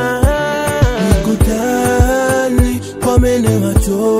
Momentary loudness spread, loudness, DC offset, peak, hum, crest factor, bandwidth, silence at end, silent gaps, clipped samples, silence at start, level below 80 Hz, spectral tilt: 3 LU; -14 LUFS; under 0.1%; 0 dBFS; none; 12 dB; 16.5 kHz; 0 s; none; 0.2%; 0 s; -20 dBFS; -6 dB/octave